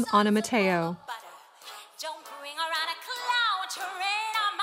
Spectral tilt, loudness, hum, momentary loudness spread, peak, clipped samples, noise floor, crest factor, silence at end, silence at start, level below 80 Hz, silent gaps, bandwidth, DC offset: -3.5 dB/octave; -28 LUFS; none; 17 LU; -8 dBFS; under 0.1%; -49 dBFS; 20 dB; 0 s; 0 s; -78 dBFS; none; 16 kHz; under 0.1%